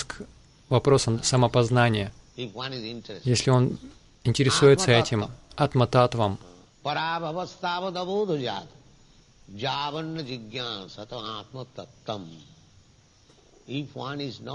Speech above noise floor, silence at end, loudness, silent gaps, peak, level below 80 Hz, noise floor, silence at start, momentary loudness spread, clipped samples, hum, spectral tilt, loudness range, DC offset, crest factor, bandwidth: 33 dB; 0 s; -25 LUFS; none; -6 dBFS; -54 dBFS; -58 dBFS; 0 s; 16 LU; under 0.1%; none; -5 dB/octave; 15 LU; under 0.1%; 20 dB; 11.5 kHz